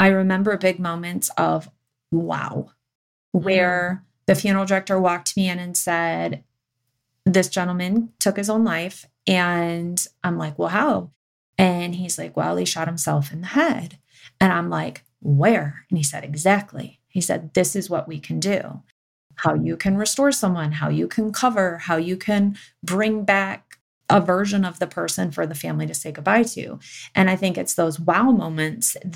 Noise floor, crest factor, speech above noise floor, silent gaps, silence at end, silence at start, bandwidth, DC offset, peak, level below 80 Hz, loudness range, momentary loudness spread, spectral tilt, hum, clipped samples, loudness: -76 dBFS; 18 dB; 55 dB; 2.95-3.32 s, 11.16-11.53 s, 18.92-19.30 s, 23.81-24.01 s; 0 s; 0 s; 17 kHz; under 0.1%; -4 dBFS; -60 dBFS; 2 LU; 9 LU; -5 dB/octave; none; under 0.1%; -21 LUFS